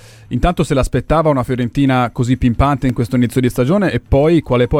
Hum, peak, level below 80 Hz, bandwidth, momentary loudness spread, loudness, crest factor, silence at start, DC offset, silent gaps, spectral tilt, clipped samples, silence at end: none; 0 dBFS; -26 dBFS; 15.5 kHz; 4 LU; -15 LUFS; 14 dB; 0.3 s; under 0.1%; none; -7.5 dB/octave; under 0.1%; 0 s